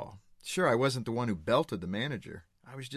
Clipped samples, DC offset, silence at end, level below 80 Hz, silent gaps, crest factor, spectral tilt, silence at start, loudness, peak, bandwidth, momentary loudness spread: under 0.1%; under 0.1%; 0 s; -60 dBFS; none; 18 dB; -5.5 dB/octave; 0 s; -31 LUFS; -14 dBFS; 14 kHz; 20 LU